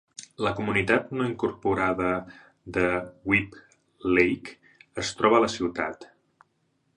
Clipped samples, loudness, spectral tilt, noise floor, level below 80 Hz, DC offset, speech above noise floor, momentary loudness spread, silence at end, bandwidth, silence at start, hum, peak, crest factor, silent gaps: under 0.1%; -26 LUFS; -5 dB/octave; -71 dBFS; -54 dBFS; under 0.1%; 46 dB; 12 LU; 0.9 s; 10.5 kHz; 0.2 s; none; -6 dBFS; 22 dB; none